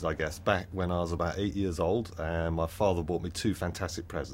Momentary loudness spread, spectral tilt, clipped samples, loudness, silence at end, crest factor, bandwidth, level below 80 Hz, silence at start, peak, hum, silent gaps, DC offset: 5 LU; -6 dB/octave; under 0.1%; -31 LUFS; 0 s; 20 dB; 16.5 kHz; -44 dBFS; 0 s; -10 dBFS; none; none; under 0.1%